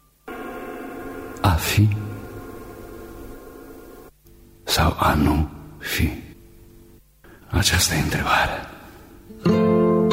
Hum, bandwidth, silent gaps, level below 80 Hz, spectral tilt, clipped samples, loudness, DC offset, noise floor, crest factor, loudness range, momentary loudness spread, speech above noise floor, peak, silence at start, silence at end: none; 16 kHz; none; -34 dBFS; -4.5 dB/octave; under 0.1%; -21 LUFS; under 0.1%; -50 dBFS; 18 dB; 4 LU; 21 LU; 30 dB; -4 dBFS; 0.25 s; 0 s